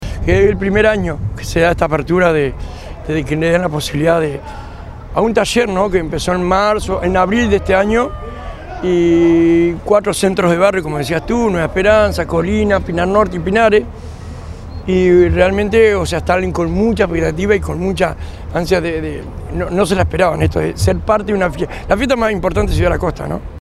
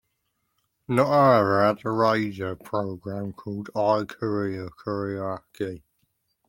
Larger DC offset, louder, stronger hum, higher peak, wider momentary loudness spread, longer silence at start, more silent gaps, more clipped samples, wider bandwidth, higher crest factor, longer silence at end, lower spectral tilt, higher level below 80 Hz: neither; first, -14 LUFS vs -25 LUFS; neither; first, 0 dBFS vs -4 dBFS; about the same, 13 LU vs 15 LU; second, 0 s vs 0.9 s; neither; neither; second, 14 kHz vs 16.5 kHz; second, 14 dB vs 20 dB; second, 0 s vs 0.7 s; second, -6 dB/octave vs -7.5 dB/octave; first, -28 dBFS vs -64 dBFS